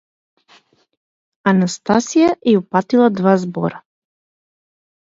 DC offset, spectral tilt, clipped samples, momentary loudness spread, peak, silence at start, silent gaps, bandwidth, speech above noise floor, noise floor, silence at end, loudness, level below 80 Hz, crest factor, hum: under 0.1%; -6 dB/octave; under 0.1%; 8 LU; 0 dBFS; 1.45 s; none; 7.8 kHz; 38 dB; -53 dBFS; 1.35 s; -16 LUFS; -60 dBFS; 18 dB; none